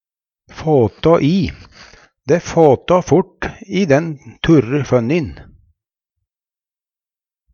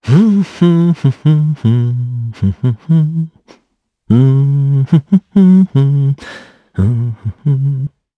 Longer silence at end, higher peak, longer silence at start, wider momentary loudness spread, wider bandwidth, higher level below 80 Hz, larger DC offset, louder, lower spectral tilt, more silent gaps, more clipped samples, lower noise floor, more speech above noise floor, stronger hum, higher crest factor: first, 2.1 s vs 0.3 s; about the same, 0 dBFS vs 0 dBFS; first, 0.55 s vs 0.05 s; about the same, 12 LU vs 11 LU; first, 7.2 kHz vs 6.4 kHz; first, -42 dBFS vs -48 dBFS; neither; about the same, -15 LUFS vs -13 LUFS; second, -7 dB/octave vs -10 dB/octave; neither; neither; first, under -90 dBFS vs -62 dBFS; first, over 76 dB vs 51 dB; neither; about the same, 16 dB vs 12 dB